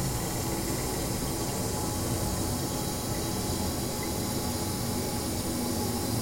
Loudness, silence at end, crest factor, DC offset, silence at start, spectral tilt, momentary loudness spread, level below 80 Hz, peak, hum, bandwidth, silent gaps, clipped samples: -30 LUFS; 0 s; 12 dB; under 0.1%; 0 s; -4 dB/octave; 1 LU; -42 dBFS; -18 dBFS; none; 16.5 kHz; none; under 0.1%